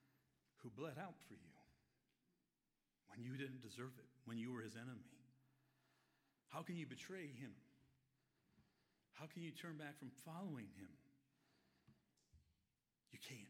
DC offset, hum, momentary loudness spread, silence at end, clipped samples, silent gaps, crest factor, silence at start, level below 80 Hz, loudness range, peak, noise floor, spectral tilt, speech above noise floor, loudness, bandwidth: under 0.1%; none; 13 LU; 0 s; under 0.1%; none; 22 dB; 0.05 s; -90 dBFS; 4 LU; -36 dBFS; under -90 dBFS; -5.5 dB/octave; over 36 dB; -55 LUFS; 16 kHz